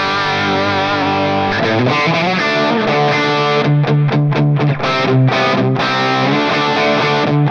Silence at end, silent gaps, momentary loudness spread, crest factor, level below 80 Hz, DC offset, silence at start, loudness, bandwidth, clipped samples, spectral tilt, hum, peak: 0 s; none; 2 LU; 12 dB; -52 dBFS; under 0.1%; 0 s; -14 LUFS; 7 kHz; under 0.1%; -6.5 dB/octave; none; -2 dBFS